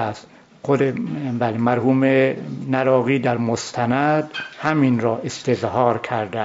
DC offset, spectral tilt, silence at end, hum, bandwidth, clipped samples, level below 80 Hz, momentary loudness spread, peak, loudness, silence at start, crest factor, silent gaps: under 0.1%; -6.5 dB/octave; 0 s; none; 7.8 kHz; under 0.1%; -62 dBFS; 8 LU; -4 dBFS; -20 LUFS; 0 s; 16 dB; none